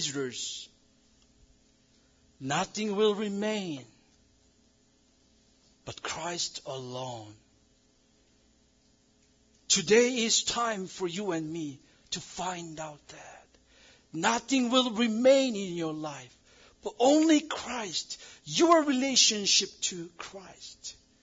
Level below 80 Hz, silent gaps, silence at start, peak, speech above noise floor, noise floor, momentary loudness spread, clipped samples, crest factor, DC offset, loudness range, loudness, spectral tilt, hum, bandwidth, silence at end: -68 dBFS; none; 0 s; -8 dBFS; 37 dB; -66 dBFS; 20 LU; under 0.1%; 22 dB; under 0.1%; 13 LU; -28 LUFS; -2.5 dB/octave; none; 7.8 kHz; 0.3 s